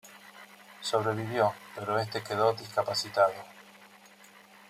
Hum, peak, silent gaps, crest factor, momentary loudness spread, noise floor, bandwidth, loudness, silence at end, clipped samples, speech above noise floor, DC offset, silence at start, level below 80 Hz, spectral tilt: none; -10 dBFS; none; 22 dB; 22 LU; -55 dBFS; 16 kHz; -30 LUFS; 0.3 s; under 0.1%; 26 dB; under 0.1%; 0.05 s; -76 dBFS; -4.5 dB/octave